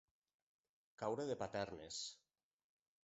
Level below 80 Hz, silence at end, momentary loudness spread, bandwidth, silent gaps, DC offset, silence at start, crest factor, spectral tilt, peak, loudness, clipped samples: -76 dBFS; 0.9 s; 7 LU; 8 kHz; none; under 0.1%; 1 s; 20 dB; -3.5 dB/octave; -28 dBFS; -46 LUFS; under 0.1%